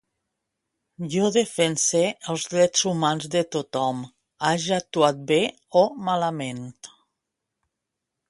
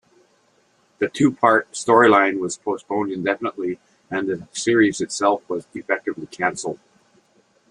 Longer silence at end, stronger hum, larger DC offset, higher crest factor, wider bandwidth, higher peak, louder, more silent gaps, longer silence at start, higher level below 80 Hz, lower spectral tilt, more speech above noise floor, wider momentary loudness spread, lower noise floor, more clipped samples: first, 1.45 s vs 0.95 s; neither; neither; about the same, 22 dB vs 20 dB; about the same, 11.5 kHz vs 11 kHz; second, -4 dBFS vs 0 dBFS; about the same, -23 LUFS vs -21 LUFS; neither; about the same, 1 s vs 1 s; about the same, -68 dBFS vs -64 dBFS; about the same, -3.5 dB/octave vs -4.5 dB/octave; first, 60 dB vs 41 dB; second, 11 LU vs 14 LU; first, -83 dBFS vs -61 dBFS; neither